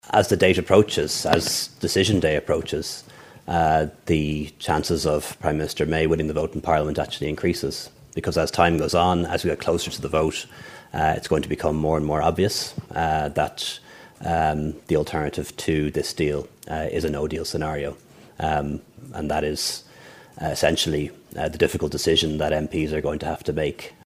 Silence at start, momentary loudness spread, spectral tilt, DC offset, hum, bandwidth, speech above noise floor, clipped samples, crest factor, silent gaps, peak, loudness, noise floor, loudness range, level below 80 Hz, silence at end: 0.05 s; 10 LU; -4.5 dB/octave; under 0.1%; none; 15.5 kHz; 24 dB; under 0.1%; 24 dB; none; 0 dBFS; -23 LUFS; -47 dBFS; 4 LU; -42 dBFS; 0.15 s